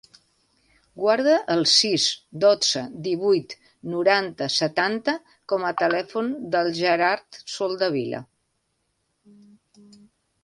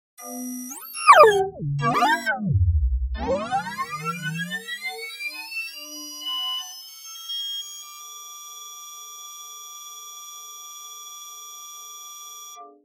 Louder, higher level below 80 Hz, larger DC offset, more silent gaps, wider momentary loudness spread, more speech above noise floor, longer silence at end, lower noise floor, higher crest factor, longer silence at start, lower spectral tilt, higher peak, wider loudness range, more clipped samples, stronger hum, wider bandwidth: about the same, -22 LUFS vs -23 LUFS; second, -68 dBFS vs -36 dBFS; neither; neither; second, 11 LU vs 17 LU; first, 51 dB vs 20 dB; first, 2.2 s vs 0.15 s; first, -73 dBFS vs -42 dBFS; second, 18 dB vs 24 dB; first, 0.95 s vs 0.2 s; about the same, -3 dB/octave vs -4 dB/octave; second, -6 dBFS vs 0 dBFS; second, 6 LU vs 17 LU; neither; neither; second, 11.5 kHz vs 16 kHz